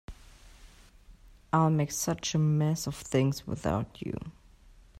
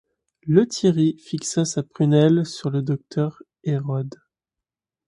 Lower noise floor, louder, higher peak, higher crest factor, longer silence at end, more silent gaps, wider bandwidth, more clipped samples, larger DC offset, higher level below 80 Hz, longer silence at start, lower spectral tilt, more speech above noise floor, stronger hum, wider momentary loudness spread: second, -56 dBFS vs -88 dBFS; second, -30 LUFS vs -22 LUFS; second, -12 dBFS vs -4 dBFS; about the same, 20 dB vs 20 dB; second, 0.7 s vs 0.95 s; neither; first, 15 kHz vs 11.5 kHz; neither; neither; first, -52 dBFS vs -62 dBFS; second, 0.1 s vs 0.45 s; about the same, -5.5 dB/octave vs -6.5 dB/octave; second, 27 dB vs 67 dB; neither; about the same, 12 LU vs 11 LU